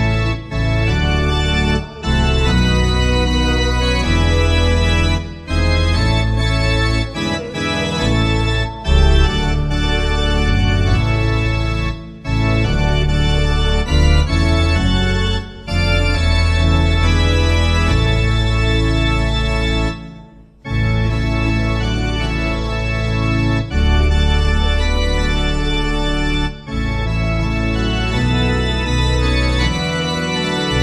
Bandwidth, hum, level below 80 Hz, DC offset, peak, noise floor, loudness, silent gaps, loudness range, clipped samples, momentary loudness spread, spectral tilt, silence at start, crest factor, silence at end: 11 kHz; none; -18 dBFS; under 0.1%; 0 dBFS; -40 dBFS; -17 LUFS; none; 3 LU; under 0.1%; 5 LU; -5.5 dB/octave; 0 s; 16 dB; 0 s